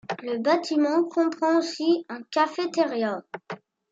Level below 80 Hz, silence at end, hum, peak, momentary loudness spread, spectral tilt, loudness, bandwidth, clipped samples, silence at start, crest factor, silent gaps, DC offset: -80 dBFS; 0.35 s; none; -10 dBFS; 14 LU; -4.5 dB/octave; -25 LUFS; 7.8 kHz; under 0.1%; 0.1 s; 16 dB; none; under 0.1%